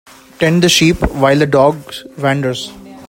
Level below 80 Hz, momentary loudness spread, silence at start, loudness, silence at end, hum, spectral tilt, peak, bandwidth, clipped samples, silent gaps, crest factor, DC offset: -32 dBFS; 15 LU; 0.4 s; -13 LUFS; 0.05 s; none; -4.5 dB/octave; 0 dBFS; 16.5 kHz; under 0.1%; none; 14 dB; under 0.1%